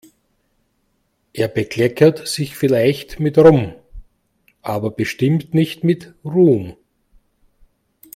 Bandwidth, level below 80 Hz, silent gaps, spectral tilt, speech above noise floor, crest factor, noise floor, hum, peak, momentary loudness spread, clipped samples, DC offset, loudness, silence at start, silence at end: 16 kHz; -48 dBFS; none; -7 dB/octave; 50 dB; 18 dB; -66 dBFS; none; 0 dBFS; 12 LU; under 0.1%; under 0.1%; -17 LUFS; 1.35 s; 1.45 s